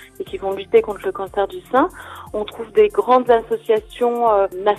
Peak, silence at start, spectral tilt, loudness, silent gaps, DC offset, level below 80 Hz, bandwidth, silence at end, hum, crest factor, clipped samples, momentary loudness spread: -2 dBFS; 0.2 s; -5.5 dB/octave; -19 LUFS; none; under 0.1%; -48 dBFS; 14 kHz; 0 s; none; 16 dB; under 0.1%; 12 LU